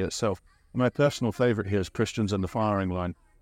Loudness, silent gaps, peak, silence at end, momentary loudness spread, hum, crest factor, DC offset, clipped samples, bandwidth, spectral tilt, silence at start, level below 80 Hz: -28 LUFS; none; -10 dBFS; 0.3 s; 8 LU; none; 18 dB; under 0.1%; under 0.1%; 16 kHz; -6 dB/octave; 0 s; -52 dBFS